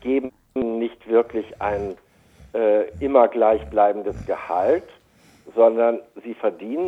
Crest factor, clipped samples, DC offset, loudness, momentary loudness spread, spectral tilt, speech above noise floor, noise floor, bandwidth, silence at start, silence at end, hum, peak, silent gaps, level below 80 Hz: 20 dB; under 0.1%; under 0.1%; -21 LUFS; 12 LU; -8 dB/octave; 34 dB; -55 dBFS; 6.2 kHz; 0.05 s; 0 s; none; -2 dBFS; none; -48 dBFS